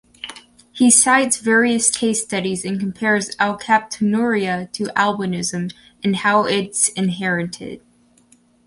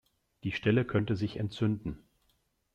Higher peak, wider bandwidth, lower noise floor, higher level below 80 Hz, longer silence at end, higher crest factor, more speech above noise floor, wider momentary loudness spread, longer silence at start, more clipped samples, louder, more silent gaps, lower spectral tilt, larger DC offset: first, 0 dBFS vs -14 dBFS; first, 11.5 kHz vs 8.4 kHz; second, -55 dBFS vs -74 dBFS; about the same, -60 dBFS vs -58 dBFS; about the same, 0.9 s vs 0.8 s; about the same, 18 dB vs 18 dB; second, 36 dB vs 44 dB; about the same, 13 LU vs 12 LU; second, 0.25 s vs 0.45 s; neither; first, -18 LUFS vs -32 LUFS; neither; second, -3 dB/octave vs -8 dB/octave; neither